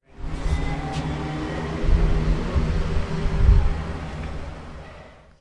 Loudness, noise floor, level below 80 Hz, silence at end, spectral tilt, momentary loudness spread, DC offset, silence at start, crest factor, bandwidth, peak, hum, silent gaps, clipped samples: -26 LUFS; -45 dBFS; -24 dBFS; 0.3 s; -7 dB/octave; 17 LU; 0.4%; 0.15 s; 18 dB; 9.6 kHz; -4 dBFS; none; none; under 0.1%